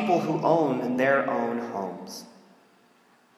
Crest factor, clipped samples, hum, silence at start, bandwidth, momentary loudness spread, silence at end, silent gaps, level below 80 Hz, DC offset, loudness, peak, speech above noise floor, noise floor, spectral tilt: 18 dB; under 0.1%; none; 0 s; 15.5 kHz; 16 LU; 1.1 s; none; -80 dBFS; under 0.1%; -25 LUFS; -8 dBFS; 35 dB; -61 dBFS; -6.5 dB/octave